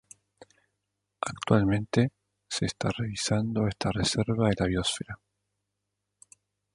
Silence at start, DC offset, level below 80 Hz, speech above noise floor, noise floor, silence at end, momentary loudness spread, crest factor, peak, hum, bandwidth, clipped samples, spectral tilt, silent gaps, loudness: 1.2 s; under 0.1%; -50 dBFS; 56 dB; -83 dBFS; 1.6 s; 11 LU; 24 dB; -6 dBFS; 50 Hz at -45 dBFS; 11.5 kHz; under 0.1%; -5 dB/octave; none; -28 LUFS